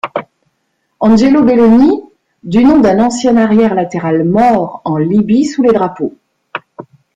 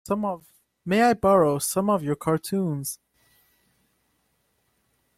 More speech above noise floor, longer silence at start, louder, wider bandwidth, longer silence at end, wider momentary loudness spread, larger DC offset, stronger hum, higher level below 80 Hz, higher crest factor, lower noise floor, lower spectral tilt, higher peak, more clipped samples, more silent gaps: first, 55 dB vs 48 dB; about the same, 0.05 s vs 0.05 s; first, -10 LUFS vs -23 LUFS; second, 9.2 kHz vs 16.5 kHz; second, 0.35 s vs 2.25 s; about the same, 14 LU vs 15 LU; neither; neither; first, -42 dBFS vs -58 dBFS; second, 10 dB vs 18 dB; second, -64 dBFS vs -71 dBFS; first, -7 dB/octave vs -5.5 dB/octave; first, 0 dBFS vs -8 dBFS; neither; neither